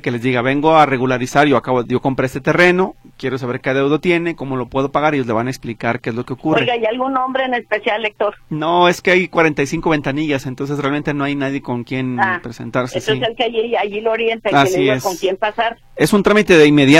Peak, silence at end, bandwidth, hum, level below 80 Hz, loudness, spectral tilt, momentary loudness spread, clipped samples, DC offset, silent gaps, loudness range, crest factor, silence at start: 0 dBFS; 0 s; 15.5 kHz; none; -46 dBFS; -16 LUFS; -5.5 dB/octave; 10 LU; under 0.1%; under 0.1%; none; 4 LU; 16 dB; 0.05 s